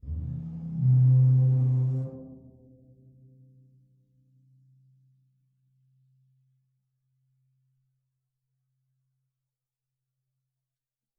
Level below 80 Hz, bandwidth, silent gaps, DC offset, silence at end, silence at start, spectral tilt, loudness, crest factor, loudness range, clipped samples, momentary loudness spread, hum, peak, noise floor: -52 dBFS; 1.1 kHz; none; under 0.1%; 8.85 s; 0.05 s; -13 dB/octave; -24 LUFS; 16 dB; 13 LU; under 0.1%; 18 LU; none; -14 dBFS; under -90 dBFS